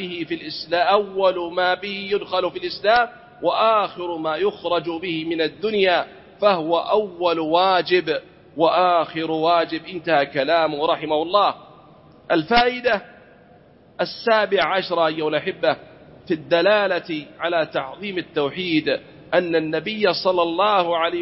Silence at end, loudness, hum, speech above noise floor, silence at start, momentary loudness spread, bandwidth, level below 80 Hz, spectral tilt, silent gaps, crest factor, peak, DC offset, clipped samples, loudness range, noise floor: 0 s; -21 LUFS; none; 30 dB; 0 s; 9 LU; 5.8 kHz; -56 dBFS; -8 dB/octave; none; 18 dB; -2 dBFS; under 0.1%; under 0.1%; 3 LU; -50 dBFS